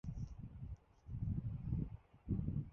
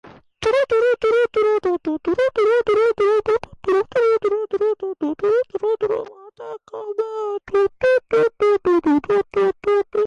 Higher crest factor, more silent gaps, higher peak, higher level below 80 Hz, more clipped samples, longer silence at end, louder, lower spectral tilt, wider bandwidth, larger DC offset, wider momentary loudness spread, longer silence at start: first, 16 dB vs 10 dB; neither; second, -28 dBFS vs -10 dBFS; about the same, -50 dBFS vs -54 dBFS; neither; about the same, 0 s vs 0 s; second, -45 LUFS vs -19 LUFS; first, -12 dB/octave vs -5.5 dB/octave; second, 6.4 kHz vs 9.2 kHz; neither; first, 12 LU vs 9 LU; about the same, 0.05 s vs 0.05 s